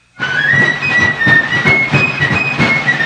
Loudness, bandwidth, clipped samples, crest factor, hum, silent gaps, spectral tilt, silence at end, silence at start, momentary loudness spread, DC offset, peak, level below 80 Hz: -10 LUFS; 10 kHz; under 0.1%; 12 dB; none; none; -5 dB/octave; 0 s; 0.2 s; 3 LU; under 0.1%; 0 dBFS; -44 dBFS